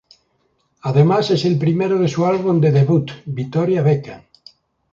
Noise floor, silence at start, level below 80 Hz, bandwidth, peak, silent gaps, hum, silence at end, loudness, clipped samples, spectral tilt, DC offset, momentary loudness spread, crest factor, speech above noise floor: -65 dBFS; 0.85 s; -56 dBFS; 7.4 kHz; -2 dBFS; none; none; 0.75 s; -17 LUFS; under 0.1%; -8 dB/octave; under 0.1%; 10 LU; 16 dB; 49 dB